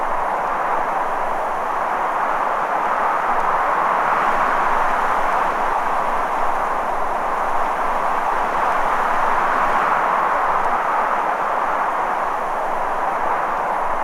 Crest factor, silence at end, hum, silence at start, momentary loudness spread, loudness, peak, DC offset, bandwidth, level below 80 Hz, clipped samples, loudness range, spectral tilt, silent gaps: 14 dB; 0 s; none; 0 s; 4 LU; -19 LUFS; -4 dBFS; under 0.1%; 15.5 kHz; -36 dBFS; under 0.1%; 2 LU; -4 dB/octave; none